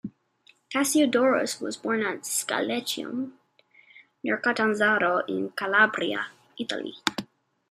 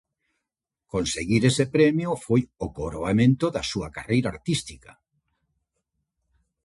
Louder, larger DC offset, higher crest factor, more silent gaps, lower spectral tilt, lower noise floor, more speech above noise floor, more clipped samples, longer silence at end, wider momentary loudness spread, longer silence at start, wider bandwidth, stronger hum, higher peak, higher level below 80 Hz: about the same, -26 LUFS vs -24 LUFS; neither; first, 26 dB vs 18 dB; neither; second, -2.5 dB/octave vs -5.5 dB/octave; second, -62 dBFS vs -87 dBFS; second, 36 dB vs 63 dB; neither; second, 0.45 s vs 1.85 s; about the same, 13 LU vs 12 LU; second, 0.05 s vs 0.95 s; first, 15 kHz vs 11.5 kHz; neither; first, 0 dBFS vs -6 dBFS; second, -74 dBFS vs -48 dBFS